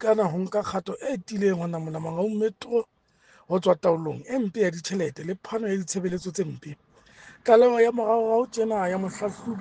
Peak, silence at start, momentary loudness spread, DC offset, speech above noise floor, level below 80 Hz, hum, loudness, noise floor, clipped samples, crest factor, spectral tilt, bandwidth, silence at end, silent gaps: -4 dBFS; 0 s; 11 LU; under 0.1%; 34 dB; -64 dBFS; none; -25 LUFS; -59 dBFS; under 0.1%; 22 dB; -6 dB/octave; 9.8 kHz; 0 s; none